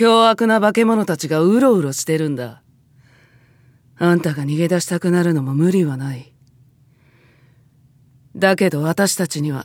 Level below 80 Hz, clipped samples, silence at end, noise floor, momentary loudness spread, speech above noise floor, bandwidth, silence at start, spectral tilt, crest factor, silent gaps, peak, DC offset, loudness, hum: -66 dBFS; under 0.1%; 0 s; -53 dBFS; 8 LU; 37 dB; 17.5 kHz; 0 s; -5.5 dB/octave; 18 dB; none; 0 dBFS; under 0.1%; -17 LUFS; none